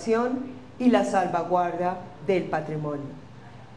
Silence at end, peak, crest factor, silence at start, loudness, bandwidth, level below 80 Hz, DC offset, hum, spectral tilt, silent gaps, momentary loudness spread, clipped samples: 0 s; -6 dBFS; 20 dB; 0 s; -26 LUFS; 11 kHz; -60 dBFS; 0.3%; none; -6.5 dB/octave; none; 18 LU; under 0.1%